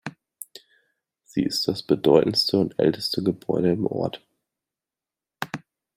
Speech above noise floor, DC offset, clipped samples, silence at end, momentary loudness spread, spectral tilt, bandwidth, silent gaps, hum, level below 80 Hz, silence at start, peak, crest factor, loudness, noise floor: 67 dB; under 0.1%; under 0.1%; 0.4 s; 22 LU; -5.5 dB/octave; 16 kHz; none; none; -62 dBFS; 0.05 s; -4 dBFS; 22 dB; -23 LUFS; -90 dBFS